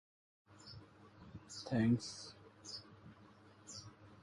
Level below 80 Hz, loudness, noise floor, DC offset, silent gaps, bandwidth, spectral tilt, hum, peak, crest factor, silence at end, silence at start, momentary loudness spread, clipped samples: -70 dBFS; -41 LUFS; -63 dBFS; under 0.1%; none; 11.5 kHz; -5.5 dB/octave; none; -24 dBFS; 20 dB; 0 s; 0.5 s; 25 LU; under 0.1%